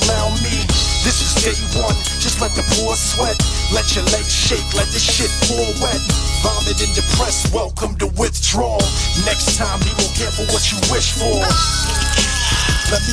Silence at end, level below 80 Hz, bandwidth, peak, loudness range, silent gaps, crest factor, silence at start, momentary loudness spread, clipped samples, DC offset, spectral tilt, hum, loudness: 0 s; -22 dBFS; 11 kHz; -2 dBFS; 1 LU; none; 16 dB; 0 s; 3 LU; under 0.1%; under 0.1%; -3 dB/octave; none; -16 LUFS